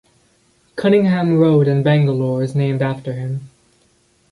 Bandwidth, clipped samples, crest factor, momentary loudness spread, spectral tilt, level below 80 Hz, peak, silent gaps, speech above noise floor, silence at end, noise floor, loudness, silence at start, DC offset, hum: 11.5 kHz; under 0.1%; 14 dB; 12 LU; -9 dB/octave; -56 dBFS; -2 dBFS; none; 42 dB; 0.85 s; -58 dBFS; -16 LUFS; 0.75 s; under 0.1%; none